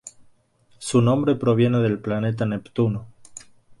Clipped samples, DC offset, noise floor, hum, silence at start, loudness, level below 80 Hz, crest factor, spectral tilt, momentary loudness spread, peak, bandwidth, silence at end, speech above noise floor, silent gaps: under 0.1%; under 0.1%; -59 dBFS; none; 0.05 s; -22 LUFS; -54 dBFS; 16 dB; -7 dB/octave; 23 LU; -8 dBFS; 11.5 kHz; 0.4 s; 39 dB; none